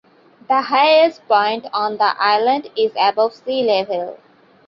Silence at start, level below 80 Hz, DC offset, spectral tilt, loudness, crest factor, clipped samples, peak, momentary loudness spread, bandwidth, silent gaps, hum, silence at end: 0.5 s; -68 dBFS; under 0.1%; -5 dB/octave; -17 LUFS; 16 dB; under 0.1%; -2 dBFS; 8 LU; 6 kHz; none; none; 0.5 s